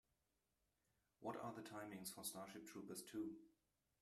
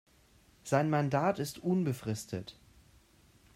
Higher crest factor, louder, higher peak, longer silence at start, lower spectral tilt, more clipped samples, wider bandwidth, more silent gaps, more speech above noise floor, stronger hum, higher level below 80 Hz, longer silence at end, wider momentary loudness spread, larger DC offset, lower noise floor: about the same, 20 dB vs 20 dB; second, -53 LUFS vs -32 LUFS; second, -36 dBFS vs -14 dBFS; first, 1.2 s vs 0.65 s; second, -3.5 dB/octave vs -6.5 dB/octave; neither; about the same, 15 kHz vs 16 kHz; neither; first, 36 dB vs 32 dB; neither; second, -88 dBFS vs -66 dBFS; second, 0.5 s vs 1.05 s; second, 6 LU vs 13 LU; neither; first, -89 dBFS vs -64 dBFS